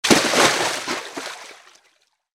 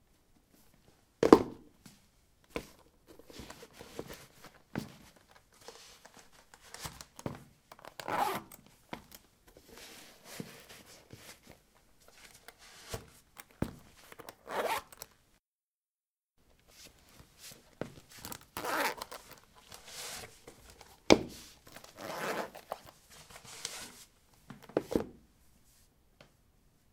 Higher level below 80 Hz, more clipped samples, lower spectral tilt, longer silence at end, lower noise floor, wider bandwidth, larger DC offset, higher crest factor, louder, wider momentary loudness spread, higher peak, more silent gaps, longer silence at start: about the same, -60 dBFS vs -62 dBFS; neither; second, -2 dB/octave vs -4 dB/octave; second, 0.8 s vs 1.8 s; second, -63 dBFS vs under -90 dBFS; about the same, 18 kHz vs 18 kHz; neither; second, 20 dB vs 38 dB; first, -18 LUFS vs -35 LUFS; about the same, 21 LU vs 22 LU; about the same, -2 dBFS vs -2 dBFS; second, none vs 15.46-15.81 s, 15.90-15.94 s, 16.10-16.14 s; second, 0.05 s vs 1.2 s